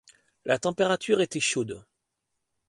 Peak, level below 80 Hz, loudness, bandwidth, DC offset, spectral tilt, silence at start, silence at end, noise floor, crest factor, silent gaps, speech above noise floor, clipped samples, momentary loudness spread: -10 dBFS; -68 dBFS; -26 LUFS; 11.5 kHz; under 0.1%; -3.5 dB/octave; 0.45 s; 0.9 s; -81 dBFS; 18 dB; none; 55 dB; under 0.1%; 13 LU